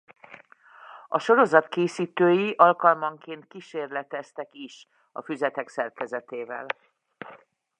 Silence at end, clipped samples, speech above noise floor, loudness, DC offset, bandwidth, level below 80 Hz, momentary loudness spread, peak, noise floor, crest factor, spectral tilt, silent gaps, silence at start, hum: 0.45 s; under 0.1%; 28 dB; -24 LUFS; under 0.1%; 9.8 kHz; -84 dBFS; 23 LU; -2 dBFS; -53 dBFS; 24 dB; -6 dB/octave; none; 0.3 s; none